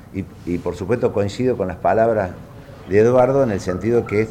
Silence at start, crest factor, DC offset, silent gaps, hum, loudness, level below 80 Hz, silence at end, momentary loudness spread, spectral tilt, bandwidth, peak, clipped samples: 0.1 s; 14 dB; under 0.1%; none; none; -19 LUFS; -46 dBFS; 0 s; 14 LU; -7.5 dB/octave; 13.5 kHz; -4 dBFS; under 0.1%